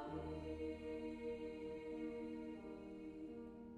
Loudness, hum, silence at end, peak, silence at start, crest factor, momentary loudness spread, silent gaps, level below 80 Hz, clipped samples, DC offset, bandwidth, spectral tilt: -49 LUFS; none; 0 s; -34 dBFS; 0 s; 14 dB; 5 LU; none; -64 dBFS; under 0.1%; under 0.1%; 10.5 kHz; -7.5 dB/octave